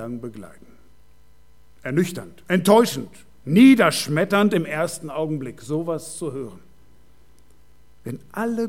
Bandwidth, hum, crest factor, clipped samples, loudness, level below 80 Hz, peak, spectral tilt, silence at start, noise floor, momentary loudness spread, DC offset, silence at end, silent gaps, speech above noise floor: 16.5 kHz; none; 20 dB; under 0.1%; -20 LUFS; -58 dBFS; -2 dBFS; -5.5 dB/octave; 0 s; -56 dBFS; 22 LU; 0.5%; 0 s; none; 36 dB